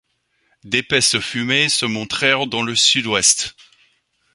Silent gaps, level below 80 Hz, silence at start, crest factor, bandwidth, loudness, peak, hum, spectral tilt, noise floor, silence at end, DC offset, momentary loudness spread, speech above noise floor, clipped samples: none; -56 dBFS; 0.65 s; 20 dB; 11.5 kHz; -16 LUFS; 0 dBFS; none; -1.5 dB/octave; -65 dBFS; 0.85 s; under 0.1%; 7 LU; 47 dB; under 0.1%